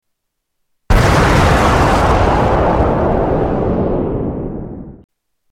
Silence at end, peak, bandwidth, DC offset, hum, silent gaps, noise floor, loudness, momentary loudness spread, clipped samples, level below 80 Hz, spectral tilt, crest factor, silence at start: 0.55 s; -2 dBFS; 16 kHz; under 0.1%; none; none; -72 dBFS; -14 LUFS; 13 LU; under 0.1%; -22 dBFS; -6.5 dB/octave; 12 dB; 0.9 s